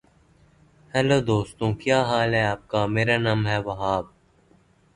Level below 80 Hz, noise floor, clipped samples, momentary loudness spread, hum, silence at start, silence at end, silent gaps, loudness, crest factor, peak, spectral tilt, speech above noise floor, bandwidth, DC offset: -50 dBFS; -59 dBFS; under 0.1%; 6 LU; none; 0.95 s; 0.9 s; none; -23 LUFS; 18 dB; -6 dBFS; -6 dB/octave; 36 dB; 11 kHz; under 0.1%